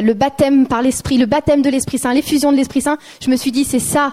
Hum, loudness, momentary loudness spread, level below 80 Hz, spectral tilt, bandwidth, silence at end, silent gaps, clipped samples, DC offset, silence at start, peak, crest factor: none; -15 LUFS; 5 LU; -42 dBFS; -4.5 dB/octave; 16 kHz; 0 s; none; under 0.1%; under 0.1%; 0 s; -2 dBFS; 14 dB